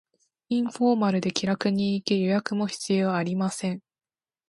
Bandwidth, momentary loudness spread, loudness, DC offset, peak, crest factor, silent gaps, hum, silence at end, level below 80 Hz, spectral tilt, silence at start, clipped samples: 11.5 kHz; 6 LU; -26 LUFS; under 0.1%; -6 dBFS; 20 dB; none; none; 0.7 s; -68 dBFS; -5.5 dB/octave; 0.5 s; under 0.1%